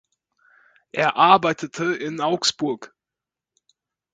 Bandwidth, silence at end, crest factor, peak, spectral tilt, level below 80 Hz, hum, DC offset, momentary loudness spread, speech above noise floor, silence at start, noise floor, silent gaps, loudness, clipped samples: 9.4 kHz; 1.3 s; 24 dB; 0 dBFS; -3.5 dB/octave; -68 dBFS; none; under 0.1%; 12 LU; 67 dB; 0.95 s; -88 dBFS; none; -20 LUFS; under 0.1%